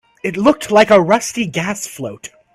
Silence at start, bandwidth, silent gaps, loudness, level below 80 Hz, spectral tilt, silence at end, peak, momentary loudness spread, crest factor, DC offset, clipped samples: 0.25 s; 15 kHz; none; -14 LUFS; -52 dBFS; -4.5 dB/octave; 0.3 s; 0 dBFS; 17 LU; 16 dB; under 0.1%; under 0.1%